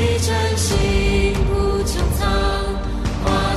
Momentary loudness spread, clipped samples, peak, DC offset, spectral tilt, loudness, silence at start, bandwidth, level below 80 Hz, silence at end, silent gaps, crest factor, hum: 5 LU; under 0.1%; -6 dBFS; under 0.1%; -5 dB/octave; -19 LUFS; 0 s; 14 kHz; -22 dBFS; 0 s; none; 12 dB; none